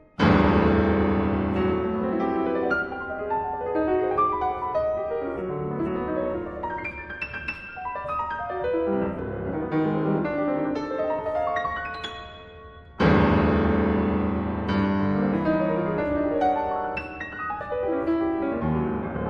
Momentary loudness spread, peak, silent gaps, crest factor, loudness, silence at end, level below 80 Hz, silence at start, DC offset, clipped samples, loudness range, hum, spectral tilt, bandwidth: 11 LU; -6 dBFS; none; 18 dB; -25 LUFS; 0 s; -40 dBFS; 0.2 s; under 0.1%; under 0.1%; 6 LU; none; -8.5 dB/octave; 7.2 kHz